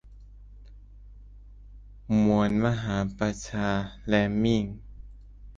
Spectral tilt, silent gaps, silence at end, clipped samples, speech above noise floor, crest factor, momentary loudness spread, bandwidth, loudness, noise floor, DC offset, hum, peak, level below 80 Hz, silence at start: -6.5 dB/octave; none; 0.05 s; under 0.1%; 22 dB; 20 dB; 8 LU; 7.6 kHz; -26 LUFS; -48 dBFS; under 0.1%; 50 Hz at -45 dBFS; -8 dBFS; -46 dBFS; 0.05 s